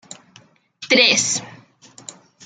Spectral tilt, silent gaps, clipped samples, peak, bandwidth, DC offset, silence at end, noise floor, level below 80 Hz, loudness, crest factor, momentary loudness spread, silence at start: -1 dB/octave; none; under 0.1%; -2 dBFS; 11 kHz; under 0.1%; 0.35 s; -52 dBFS; -70 dBFS; -15 LUFS; 22 dB; 26 LU; 0.8 s